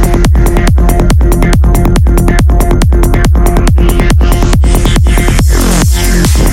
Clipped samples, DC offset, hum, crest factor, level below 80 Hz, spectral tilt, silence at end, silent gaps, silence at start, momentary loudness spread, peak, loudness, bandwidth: under 0.1%; 0.7%; none; 6 dB; -8 dBFS; -5.5 dB/octave; 0 s; none; 0 s; 0 LU; 0 dBFS; -9 LUFS; 16.5 kHz